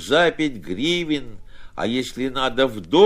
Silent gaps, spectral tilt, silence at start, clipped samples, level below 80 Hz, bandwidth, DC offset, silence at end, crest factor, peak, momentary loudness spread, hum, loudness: none; -4.5 dB/octave; 0 s; under 0.1%; -44 dBFS; 15.5 kHz; under 0.1%; 0 s; 18 dB; -2 dBFS; 8 LU; none; -22 LUFS